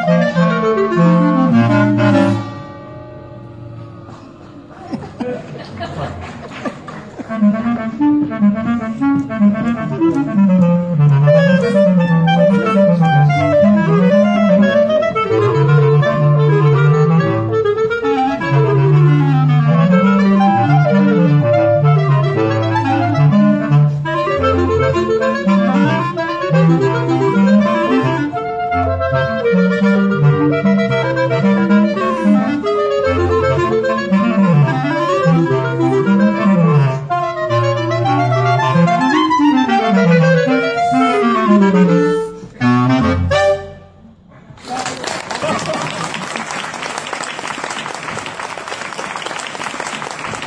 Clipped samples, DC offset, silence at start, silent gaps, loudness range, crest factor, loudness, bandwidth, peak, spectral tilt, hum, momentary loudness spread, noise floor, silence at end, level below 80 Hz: under 0.1%; under 0.1%; 0 s; none; 10 LU; 14 dB; -14 LUFS; 10 kHz; 0 dBFS; -7.5 dB/octave; none; 13 LU; -42 dBFS; 0 s; -46 dBFS